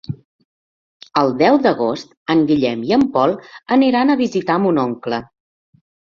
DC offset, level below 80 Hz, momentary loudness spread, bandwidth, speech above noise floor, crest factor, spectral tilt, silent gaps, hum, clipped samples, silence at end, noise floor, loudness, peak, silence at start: under 0.1%; -56 dBFS; 12 LU; 7.2 kHz; over 74 dB; 16 dB; -7 dB/octave; 0.25-0.39 s, 0.45-1.00 s, 2.17-2.26 s; none; under 0.1%; 0.9 s; under -90 dBFS; -17 LUFS; -2 dBFS; 0.1 s